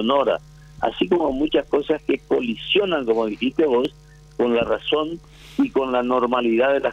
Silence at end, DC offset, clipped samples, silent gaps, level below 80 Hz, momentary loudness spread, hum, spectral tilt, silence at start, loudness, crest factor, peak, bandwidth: 0 s; under 0.1%; under 0.1%; none; -48 dBFS; 8 LU; none; -6 dB/octave; 0 s; -21 LUFS; 16 dB; -6 dBFS; 9.6 kHz